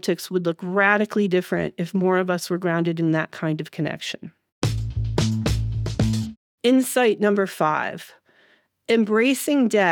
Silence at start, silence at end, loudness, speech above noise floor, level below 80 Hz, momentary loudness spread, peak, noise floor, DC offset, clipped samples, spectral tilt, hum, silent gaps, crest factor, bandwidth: 0.05 s; 0 s; -22 LUFS; 39 dB; -40 dBFS; 9 LU; -4 dBFS; -60 dBFS; under 0.1%; under 0.1%; -5.5 dB/octave; none; 4.52-4.62 s, 6.37-6.58 s; 18 dB; over 20 kHz